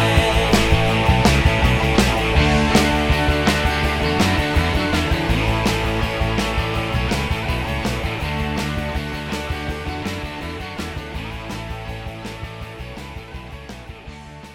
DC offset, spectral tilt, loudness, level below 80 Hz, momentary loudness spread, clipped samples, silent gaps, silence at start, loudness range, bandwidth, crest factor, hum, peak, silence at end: under 0.1%; -5 dB/octave; -19 LUFS; -26 dBFS; 17 LU; under 0.1%; none; 0 s; 14 LU; 16.5 kHz; 18 dB; none; 0 dBFS; 0 s